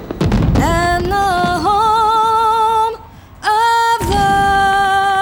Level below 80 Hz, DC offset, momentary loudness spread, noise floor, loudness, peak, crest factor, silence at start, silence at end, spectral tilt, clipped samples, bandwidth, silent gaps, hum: -28 dBFS; under 0.1%; 4 LU; -35 dBFS; -14 LUFS; -2 dBFS; 12 dB; 0 s; 0 s; -5 dB/octave; under 0.1%; over 20 kHz; none; none